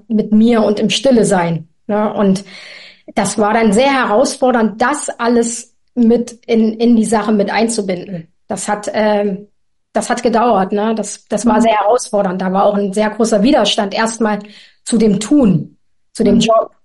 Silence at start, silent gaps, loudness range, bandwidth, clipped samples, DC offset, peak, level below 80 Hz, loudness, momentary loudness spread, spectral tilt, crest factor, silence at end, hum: 0.1 s; none; 3 LU; 11.5 kHz; under 0.1%; 0.4%; -2 dBFS; -46 dBFS; -14 LUFS; 11 LU; -5 dB/octave; 10 dB; 0.2 s; none